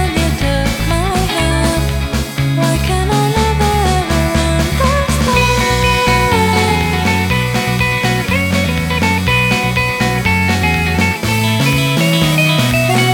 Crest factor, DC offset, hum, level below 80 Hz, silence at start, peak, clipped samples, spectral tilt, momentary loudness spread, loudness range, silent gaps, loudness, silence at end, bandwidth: 12 dB; under 0.1%; none; -22 dBFS; 0 s; 0 dBFS; under 0.1%; -5 dB/octave; 3 LU; 2 LU; none; -13 LUFS; 0 s; 19.5 kHz